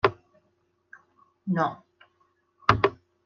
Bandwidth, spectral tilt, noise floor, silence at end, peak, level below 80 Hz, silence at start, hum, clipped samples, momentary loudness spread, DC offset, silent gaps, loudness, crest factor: 7.2 kHz; -7 dB/octave; -71 dBFS; 0.3 s; -2 dBFS; -54 dBFS; 0.05 s; none; under 0.1%; 15 LU; under 0.1%; none; -26 LUFS; 28 dB